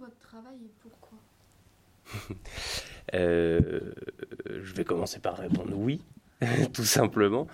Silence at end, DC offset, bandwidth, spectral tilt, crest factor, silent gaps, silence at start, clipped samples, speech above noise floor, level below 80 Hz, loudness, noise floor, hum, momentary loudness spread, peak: 0 s; under 0.1%; 16.5 kHz; -5 dB/octave; 22 dB; none; 0 s; under 0.1%; 33 dB; -52 dBFS; -29 LUFS; -61 dBFS; none; 18 LU; -8 dBFS